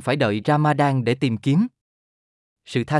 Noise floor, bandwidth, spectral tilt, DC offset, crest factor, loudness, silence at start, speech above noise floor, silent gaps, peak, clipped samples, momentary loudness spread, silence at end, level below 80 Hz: under -90 dBFS; 12 kHz; -7 dB/octave; under 0.1%; 16 dB; -21 LUFS; 0 s; over 70 dB; 1.81-2.56 s; -6 dBFS; under 0.1%; 8 LU; 0 s; -64 dBFS